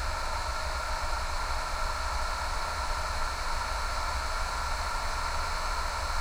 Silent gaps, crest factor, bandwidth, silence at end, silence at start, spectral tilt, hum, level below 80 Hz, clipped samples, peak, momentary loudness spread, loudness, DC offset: none; 12 dB; 16 kHz; 0 s; 0 s; -2.5 dB/octave; none; -34 dBFS; under 0.1%; -18 dBFS; 1 LU; -32 LUFS; under 0.1%